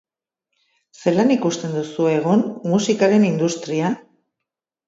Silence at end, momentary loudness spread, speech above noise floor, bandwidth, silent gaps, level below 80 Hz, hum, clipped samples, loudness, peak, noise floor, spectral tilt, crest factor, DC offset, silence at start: 0.85 s; 8 LU; 65 dB; 8 kHz; none; -66 dBFS; none; under 0.1%; -19 LUFS; -4 dBFS; -83 dBFS; -6 dB/octave; 16 dB; under 0.1%; 1 s